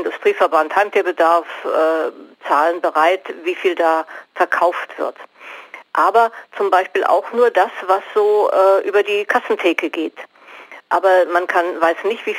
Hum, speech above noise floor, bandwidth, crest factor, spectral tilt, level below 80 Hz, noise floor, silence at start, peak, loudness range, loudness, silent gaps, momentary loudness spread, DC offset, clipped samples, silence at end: none; 23 dB; 16.5 kHz; 14 dB; -3 dB/octave; -74 dBFS; -39 dBFS; 0 s; -2 dBFS; 3 LU; -17 LUFS; none; 12 LU; under 0.1%; under 0.1%; 0 s